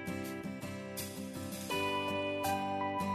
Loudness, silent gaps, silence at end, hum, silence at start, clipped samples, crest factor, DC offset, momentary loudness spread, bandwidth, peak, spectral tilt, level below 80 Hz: -37 LUFS; none; 0 s; none; 0 s; under 0.1%; 14 dB; under 0.1%; 8 LU; 14 kHz; -24 dBFS; -4.5 dB/octave; -70 dBFS